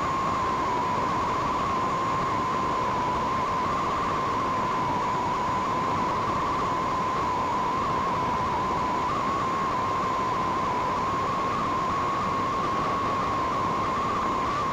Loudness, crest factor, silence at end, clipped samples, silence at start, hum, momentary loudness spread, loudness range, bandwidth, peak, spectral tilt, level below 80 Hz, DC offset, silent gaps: -26 LUFS; 12 dB; 0 s; under 0.1%; 0 s; none; 0 LU; 0 LU; 15.5 kHz; -14 dBFS; -5 dB/octave; -46 dBFS; under 0.1%; none